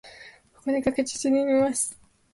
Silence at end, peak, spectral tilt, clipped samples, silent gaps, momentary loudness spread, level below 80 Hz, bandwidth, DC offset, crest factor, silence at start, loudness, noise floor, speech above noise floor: 0.4 s; -10 dBFS; -3.5 dB/octave; under 0.1%; none; 10 LU; -58 dBFS; 11.5 kHz; under 0.1%; 16 dB; 0.05 s; -25 LUFS; -50 dBFS; 26 dB